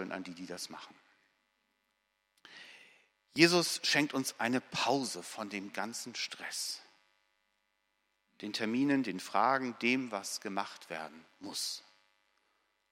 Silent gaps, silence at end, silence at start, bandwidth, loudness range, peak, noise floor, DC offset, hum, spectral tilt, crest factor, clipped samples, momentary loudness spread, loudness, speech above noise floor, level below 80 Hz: none; 1.1 s; 0 s; 16 kHz; 10 LU; -8 dBFS; -80 dBFS; under 0.1%; none; -3 dB/octave; 30 dB; under 0.1%; 16 LU; -33 LUFS; 46 dB; -84 dBFS